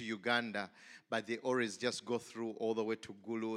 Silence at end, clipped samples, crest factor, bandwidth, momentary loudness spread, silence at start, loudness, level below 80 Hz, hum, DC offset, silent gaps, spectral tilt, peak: 0 s; under 0.1%; 22 dB; 14.5 kHz; 9 LU; 0 s; -38 LUFS; -86 dBFS; none; under 0.1%; none; -4 dB/octave; -16 dBFS